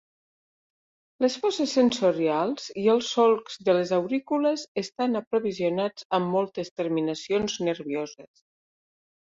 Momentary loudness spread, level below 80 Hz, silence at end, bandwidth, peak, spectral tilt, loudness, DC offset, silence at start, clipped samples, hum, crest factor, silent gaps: 8 LU; -66 dBFS; 1.1 s; 7.8 kHz; -8 dBFS; -5 dB/octave; -26 LUFS; under 0.1%; 1.2 s; under 0.1%; none; 18 dB; 4.68-4.75 s, 5.27-5.31 s, 6.05-6.10 s, 6.71-6.76 s